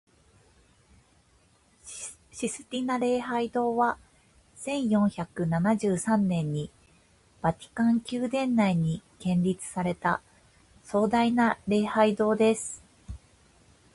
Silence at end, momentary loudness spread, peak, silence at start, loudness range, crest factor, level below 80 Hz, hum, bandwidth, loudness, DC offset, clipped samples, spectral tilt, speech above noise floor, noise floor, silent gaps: 0.8 s; 15 LU; -8 dBFS; 1.85 s; 4 LU; 20 dB; -58 dBFS; none; 11.5 kHz; -27 LUFS; under 0.1%; under 0.1%; -6 dB/octave; 37 dB; -63 dBFS; none